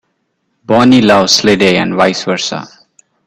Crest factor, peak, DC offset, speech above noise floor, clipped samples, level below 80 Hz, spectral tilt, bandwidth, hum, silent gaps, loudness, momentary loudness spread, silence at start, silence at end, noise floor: 12 dB; 0 dBFS; under 0.1%; 55 dB; under 0.1%; -48 dBFS; -4 dB/octave; 15 kHz; none; none; -10 LUFS; 9 LU; 0.7 s; 0.6 s; -64 dBFS